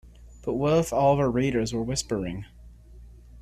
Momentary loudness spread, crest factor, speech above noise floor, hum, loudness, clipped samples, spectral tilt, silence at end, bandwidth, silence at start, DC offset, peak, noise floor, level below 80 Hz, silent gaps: 14 LU; 18 dB; 23 dB; none; -25 LUFS; under 0.1%; -6 dB/octave; 0 s; 14.5 kHz; 0.05 s; under 0.1%; -8 dBFS; -47 dBFS; -46 dBFS; none